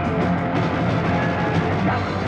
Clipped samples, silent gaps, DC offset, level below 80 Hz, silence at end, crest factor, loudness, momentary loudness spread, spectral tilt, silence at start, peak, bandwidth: under 0.1%; none; under 0.1%; -42 dBFS; 0 s; 12 dB; -21 LUFS; 1 LU; -7.5 dB/octave; 0 s; -10 dBFS; 8.2 kHz